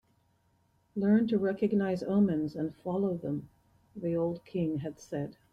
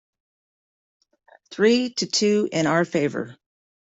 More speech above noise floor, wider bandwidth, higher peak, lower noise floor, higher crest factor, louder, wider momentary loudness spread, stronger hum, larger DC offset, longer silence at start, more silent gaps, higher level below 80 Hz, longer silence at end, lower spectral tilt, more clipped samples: second, 40 dB vs over 69 dB; second, 6.8 kHz vs 8.2 kHz; second, -16 dBFS vs -6 dBFS; second, -71 dBFS vs under -90 dBFS; about the same, 16 dB vs 18 dB; second, -31 LUFS vs -21 LUFS; about the same, 11 LU vs 13 LU; neither; neither; second, 0.95 s vs 1.5 s; neither; about the same, -66 dBFS vs -68 dBFS; second, 0.2 s vs 0.6 s; first, -8.5 dB/octave vs -4 dB/octave; neither